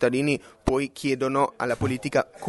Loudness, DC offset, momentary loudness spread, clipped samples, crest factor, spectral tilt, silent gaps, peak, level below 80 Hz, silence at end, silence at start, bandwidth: -26 LUFS; under 0.1%; 3 LU; under 0.1%; 20 dB; -6 dB/octave; none; -6 dBFS; -46 dBFS; 0 s; 0 s; 11.5 kHz